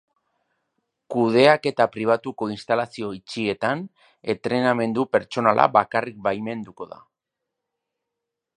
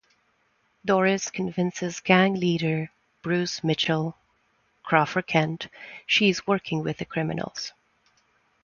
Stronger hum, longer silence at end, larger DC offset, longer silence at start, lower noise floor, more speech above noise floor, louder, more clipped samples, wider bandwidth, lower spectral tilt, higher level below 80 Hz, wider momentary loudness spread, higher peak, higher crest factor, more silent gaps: neither; first, 1.75 s vs 0.95 s; neither; first, 1.1 s vs 0.85 s; first, -83 dBFS vs -68 dBFS; first, 61 dB vs 44 dB; first, -22 LUFS vs -25 LUFS; neither; first, 10.5 kHz vs 7.2 kHz; about the same, -6 dB/octave vs -5 dB/octave; about the same, -66 dBFS vs -64 dBFS; about the same, 15 LU vs 15 LU; first, 0 dBFS vs -4 dBFS; about the same, 24 dB vs 22 dB; neither